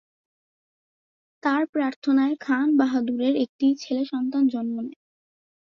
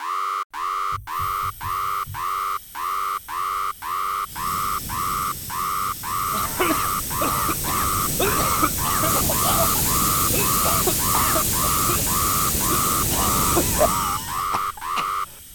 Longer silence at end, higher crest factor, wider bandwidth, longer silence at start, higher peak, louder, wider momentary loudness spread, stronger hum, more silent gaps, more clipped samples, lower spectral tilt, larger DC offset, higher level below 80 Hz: first, 0.7 s vs 0 s; about the same, 16 dB vs 18 dB; second, 6.8 kHz vs 19 kHz; first, 1.45 s vs 0 s; second, -8 dBFS vs -4 dBFS; second, -24 LUFS vs -21 LUFS; about the same, 8 LU vs 8 LU; neither; first, 1.69-1.73 s, 1.96-2.02 s, 3.49-3.59 s vs 0.45-0.50 s; neither; first, -5 dB/octave vs -2.5 dB/octave; neither; second, -72 dBFS vs -38 dBFS